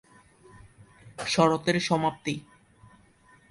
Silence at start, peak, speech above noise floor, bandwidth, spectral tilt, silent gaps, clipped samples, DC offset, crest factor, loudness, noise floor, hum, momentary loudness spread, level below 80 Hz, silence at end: 1.05 s; -8 dBFS; 33 dB; 11.5 kHz; -5 dB/octave; none; under 0.1%; under 0.1%; 22 dB; -26 LUFS; -59 dBFS; none; 14 LU; -62 dBFS; 1.1 s